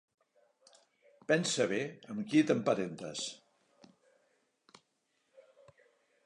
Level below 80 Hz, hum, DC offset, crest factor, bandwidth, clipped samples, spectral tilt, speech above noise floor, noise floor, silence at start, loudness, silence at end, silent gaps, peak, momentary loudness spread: -82 dBFS; none; under 0.1%; 22 dB; 11 kHz; under 0.1%; -4.5 dB/octave; 47 dB; -79 dBFS; 1.3 s; -33 LUFS; 2.9 s; none; -14 dBFS; 13 LU